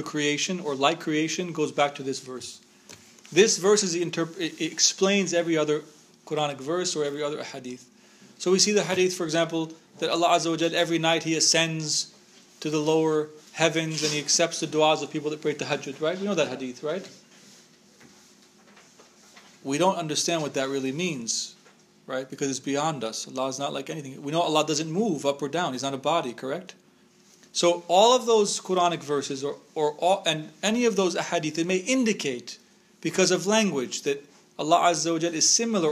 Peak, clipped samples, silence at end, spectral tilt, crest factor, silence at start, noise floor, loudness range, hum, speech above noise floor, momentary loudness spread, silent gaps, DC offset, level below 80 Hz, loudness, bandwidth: -4 dBFS; under 0.1%; 0 s; -3 dB/octave; 22 dB; 0 s; -58 dBFS; 6 LU; none; 33 dB; 13 LU; none; under 0.1%; -80 dBFS; -25 LUFS; 15.5 kHz